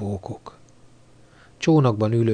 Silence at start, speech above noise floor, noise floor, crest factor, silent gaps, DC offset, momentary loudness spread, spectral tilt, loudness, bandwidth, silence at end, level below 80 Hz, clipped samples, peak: 0 s; 31 dB; -51 dBFS; 16 dB; none; under 0.1%; 19 LU; -7.5 dB/octave; -21 LUFS; 9.6 kHz; 0 s; -56 dBFS; under 0.1%; -6 dBFS